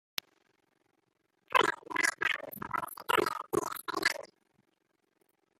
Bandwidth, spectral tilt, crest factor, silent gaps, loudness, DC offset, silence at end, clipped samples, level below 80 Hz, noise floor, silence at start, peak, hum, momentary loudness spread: 16 kHz; -2 dB/octave; 26 dB; none; -32 LUFS; under 0.1%; 1.35 s; under 0.1%; -72 dBFS; -77 dBFS; 1.5 s; -10 dBFS; none; 9 LU